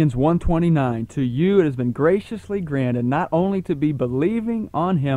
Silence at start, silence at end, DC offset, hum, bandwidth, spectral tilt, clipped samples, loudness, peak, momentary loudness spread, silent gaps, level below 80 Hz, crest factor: 0 s; 0 s; under 0.1%; none; 10.5 kHz; -9 dB/octave; under 0.1%; -21 LUFS; -4 dBFS; 6 LU; none; -36 dBFS; 16 dB